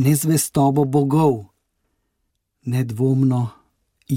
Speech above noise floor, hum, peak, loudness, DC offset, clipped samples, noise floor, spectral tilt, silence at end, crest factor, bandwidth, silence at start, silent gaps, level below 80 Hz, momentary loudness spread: 56 dB; none; -4 dBFS; -19 LUFS; under 0.1%; under 0.1%; -73 dBFS; -6.5 dB/octave; 0 s; 16 dB; 17 kHz; 0 s; none; -56 dBFS; 10 LU